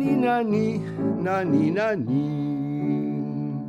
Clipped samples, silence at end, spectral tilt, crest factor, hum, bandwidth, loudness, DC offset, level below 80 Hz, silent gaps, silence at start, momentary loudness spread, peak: under 0.1%; 0 s; -8.5 dB/octave; 14 dB; none; 8.6 kHz; -24 LUFS; under 0.1%; -62 dBFS; none; 0 s; 6 LU; -10 dBFS